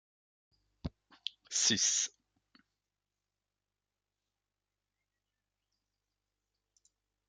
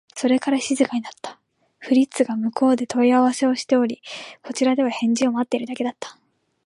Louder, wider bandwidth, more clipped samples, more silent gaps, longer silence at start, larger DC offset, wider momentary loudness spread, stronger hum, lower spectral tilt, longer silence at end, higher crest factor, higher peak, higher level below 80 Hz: second, -30 LUFS vs -21 LUFS; about the same, 10.5 kHz vs 11.5 kHz; neither; neither; first, 0.85 s vs 0.15 s; neither; first, 20 LU vs 17 LU; first, 50 Hz at -80 dBFS vs none; second, -0.5 dB/octave vs -4 dB/octave; first, 5.2 s vs 0.55 s; first, 26 dB vs 16 dB; second, -16 dBFS vs -6 dBFS; first, -66 dBFS vs -72 dBFS